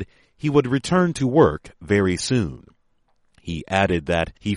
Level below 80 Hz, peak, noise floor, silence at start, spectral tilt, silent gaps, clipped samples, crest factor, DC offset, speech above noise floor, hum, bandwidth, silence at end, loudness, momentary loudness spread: -44 dBFS; -2 dBFS; -63 dBFS; 0 s; -6 dB/octave; none; under 0.1%; 18 dB; under 0.1%; 43 dB; none; 11.5 kHz; 0 s; -21 LUFS; 15 LU